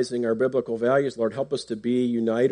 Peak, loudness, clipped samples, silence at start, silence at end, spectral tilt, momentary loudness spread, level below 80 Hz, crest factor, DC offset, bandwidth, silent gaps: -10 dBFS; -25 LUFS; under 0.1%; 0 s; 0 s; -6.5 dB/octave; 6 LU; -66 dBFS; 14 dB; under 0.1%; 10 kHz; none